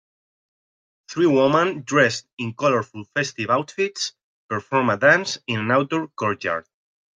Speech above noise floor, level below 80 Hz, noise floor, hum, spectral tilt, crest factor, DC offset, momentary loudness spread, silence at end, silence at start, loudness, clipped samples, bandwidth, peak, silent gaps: over 69 dB; -68 dBFS; under -90 dBFS; none; -4.5 dB/octave; 20 dB; under 0.1%; 12 LU; 0.55 s; 1.1 s; -21 LUFS; under 0.1%; 9.4 kHz; -2 dBFS; 2.33-2.37 s, 4.24-4.49 s